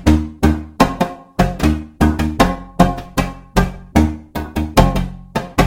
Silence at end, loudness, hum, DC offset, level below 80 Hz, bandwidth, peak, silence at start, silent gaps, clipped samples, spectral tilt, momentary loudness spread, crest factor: 0 s; -18 LUFS; none; under 0.1%; -22 dBFS; 17 kHz; 0 dBFS; 0 s; none; under 0.1%; -6.5 dB/octave; 8 LU; 16 dB